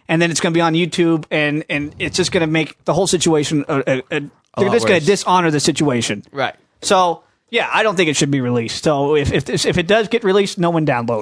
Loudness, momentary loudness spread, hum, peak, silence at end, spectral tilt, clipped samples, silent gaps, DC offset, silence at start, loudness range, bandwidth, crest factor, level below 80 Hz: -17 LUFS; 7 LU; none; -2 dBFS; 0 s; -4.5 dB/octave; under 0.1%; none; under 0.1%; 0.1 s; 1 LU; 11 kHz; 16 dB; -44 dBFS